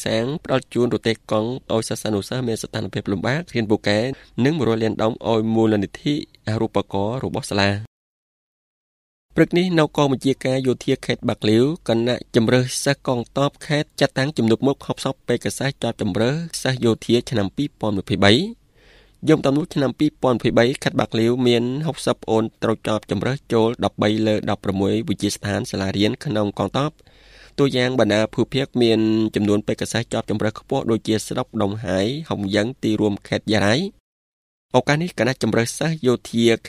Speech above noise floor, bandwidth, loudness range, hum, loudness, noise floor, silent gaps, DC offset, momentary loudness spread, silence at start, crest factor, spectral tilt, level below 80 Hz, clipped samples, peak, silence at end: 32 dB; 14.5 kHz; 3 LU; none; -21 LUFS; -52 dBFS; 7.87-9.29 s, 34.00-34.69 s; under 0.1%; 6 LU; 0 s; 20 dB; -5.5 dB/octave; -52 dBFS; under 0.1%; 0 dBFS; 0 s